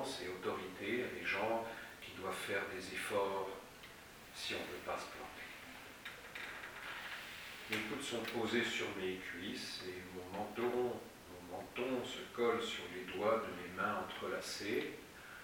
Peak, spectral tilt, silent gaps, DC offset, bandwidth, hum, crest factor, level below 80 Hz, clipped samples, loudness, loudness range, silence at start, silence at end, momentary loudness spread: -22 dBFS; -3.5 dB/octave; none; under 0.1%; over 20 kHz; none; 20 dB; -70 dBFS; under 0.1%; -42 LUFS; 6 LU; 0 s; 0 s; 13 LU